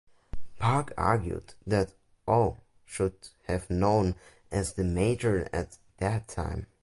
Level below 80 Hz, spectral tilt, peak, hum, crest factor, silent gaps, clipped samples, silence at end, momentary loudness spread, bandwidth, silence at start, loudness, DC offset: -44 dBFS; -6.5 dB/octave; -10 dBFS; none; 18 dB; none; under 0.1%; 0.15 s; 16 LU; 11.5 kHz; 0.35 s; -30 LUFS; under 0.1%